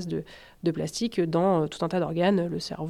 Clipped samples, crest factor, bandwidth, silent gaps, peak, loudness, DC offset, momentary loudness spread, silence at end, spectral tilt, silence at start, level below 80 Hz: under 0.1%; 16 dB; 13.5 kHz; none; -12 dBFS; -27 LUFS; under 0.1%; 9 LU; 0 s; -6 dB/octave; 0 s; -58 dBFS